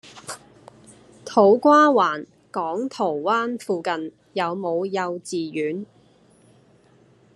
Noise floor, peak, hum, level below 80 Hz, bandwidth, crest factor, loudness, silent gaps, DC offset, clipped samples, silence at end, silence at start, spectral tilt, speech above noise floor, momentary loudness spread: -56 dBFS; -2 dBFS; none; -72 dBFS; 12.5 kHz; 20 dB; -21 LUFS; none; under 0.1%; under 0.1%; 1.5 s; 0.05 s; -5 dB/octave; 35 dB; 21 LU